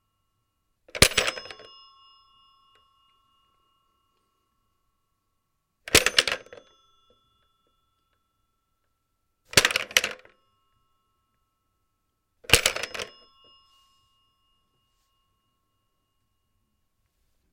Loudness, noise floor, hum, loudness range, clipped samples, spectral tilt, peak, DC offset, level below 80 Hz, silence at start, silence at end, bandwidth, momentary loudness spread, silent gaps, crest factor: -22 LUFS; -76 dBFS; none; 4 LU; under 0.1%; -1 dB/octave; 0 dBFS; under 0.1%; -48 dBFS; 0.95 s; 4.45 s; 16.5 kHz; 24 LU; none; 32 dB